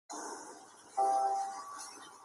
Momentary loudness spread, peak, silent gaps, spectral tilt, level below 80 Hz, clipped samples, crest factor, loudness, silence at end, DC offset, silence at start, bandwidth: 17 LU; -22 dBFS; none; -1 dB/octave; under -90 dBFS; under 0.1%; 16 dB; -36 LUFS; 0 s; under 0.1%; 0.1 s; 13 kHz